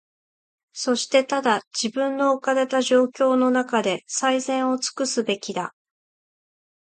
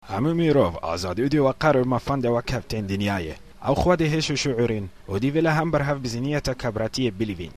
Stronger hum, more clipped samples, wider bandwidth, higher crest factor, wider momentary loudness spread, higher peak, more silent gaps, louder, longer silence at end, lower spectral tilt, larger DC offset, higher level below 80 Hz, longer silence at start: neither; neither; second, 9.4 kHz vs 14 kHz; about the same, 18 dB vs 16 dB; about the same, 7 LU vs 8 LU; about the same, -6 dBFS vs -6 dBFS; first, 1.67-1.71 s vs none; about the same, -22 LUFS vs -23 LUFS; first, 1.15 s vs 0.05 s; second, -2.5 dB/octave vs -6 dB/octave; second, under 0.1% vs 0.4%; second, -76 dBFS vs -42 dBFS; first, 0.75 s vs 0.05 s